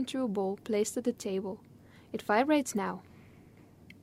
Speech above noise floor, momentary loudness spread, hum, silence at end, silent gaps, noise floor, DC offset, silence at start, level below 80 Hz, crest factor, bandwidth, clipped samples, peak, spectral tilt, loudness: 25 dB; 15 LU; none; 0.1 s; none; -56 dBFS; under 0.1%; 0 s; -70 dBFS; 18 dB; 16 kHz; under 0.1%; -14 dBFS; -4.5 dB/octave; -32 LUFS